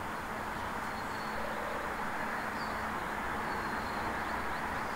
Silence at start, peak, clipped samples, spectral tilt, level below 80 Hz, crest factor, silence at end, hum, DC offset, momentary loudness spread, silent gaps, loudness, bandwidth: 0 s; -22 dBFS; under 0.1%; -4.5 dB/octave; -54 dBFS; 14 dB; 0 s; none; under 0.1%; 2 LU; none; -36 LUFS; 16 kHz